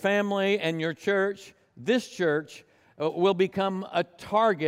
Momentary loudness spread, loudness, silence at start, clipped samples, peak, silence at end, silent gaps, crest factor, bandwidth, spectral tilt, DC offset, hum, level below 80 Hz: 7 LU; -27 LUFS; 0 s; under 0.1%; -12 dBFS; 0 s; none; 16 dB; 14.5 kHz; -5.5 dB/octave; under 0.1%; none; -72 dBFS